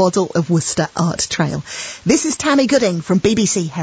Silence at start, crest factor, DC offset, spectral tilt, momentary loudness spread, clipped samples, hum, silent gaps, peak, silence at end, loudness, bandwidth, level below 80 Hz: 0 s; 16 dB; under 0.1%; -4.5 dB/octave; 6 LU; under 0.1%; none; none; -2 dBFS; 0 s; -17 LUFS; 8 kHz; -46 dBFS